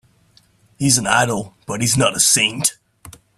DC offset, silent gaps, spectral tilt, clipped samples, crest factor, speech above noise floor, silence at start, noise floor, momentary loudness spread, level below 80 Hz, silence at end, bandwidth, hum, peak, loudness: under 0.1%; none; -2.5 dB/octave; under 0.1%; 20 dB; 38 dB; 0.8 s; -55 dBFS; 9 LU; -52 dBFS; 0.25 s; 15.5 kHz; none; 0 dBFS; -16 LUFS